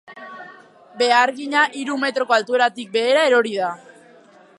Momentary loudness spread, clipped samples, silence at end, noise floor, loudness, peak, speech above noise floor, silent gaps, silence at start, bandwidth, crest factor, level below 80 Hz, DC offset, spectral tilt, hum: 21 LU; under 0.1%; 0.85 s; -49 dBFS; -18 LUFS; -2 dBFS; 30 dB; none; 0.1 s; 11.5 kHz; 20 dB; -80 dBFS; under 0.1%; -2.5 dB/octave; none